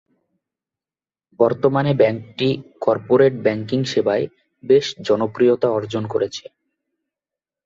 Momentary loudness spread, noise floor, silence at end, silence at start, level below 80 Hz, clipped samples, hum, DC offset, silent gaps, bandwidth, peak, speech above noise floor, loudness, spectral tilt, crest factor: 7 LU; under -90 dBFS; 1.25 s; 1.4 s; -60 dBFS; under 0.1%; none; under 0.1%; none; 7.6 kHz; -2 dBFS; over 72 dB; -19 LUFS; -6.5 dB/octave; 18 dB